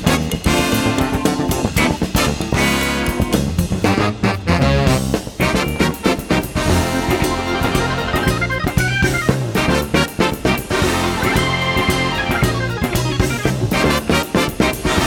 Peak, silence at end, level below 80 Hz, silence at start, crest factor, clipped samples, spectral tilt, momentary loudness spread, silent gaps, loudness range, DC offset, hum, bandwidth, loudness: 0 dBFS; 0 s; -28 dBFS; 0 s; 16 dB; under 0.1%; -5 dB/octave; 3 LU; none; 1 LU; under 0.1%; none; 20 kHz; -17 LUFS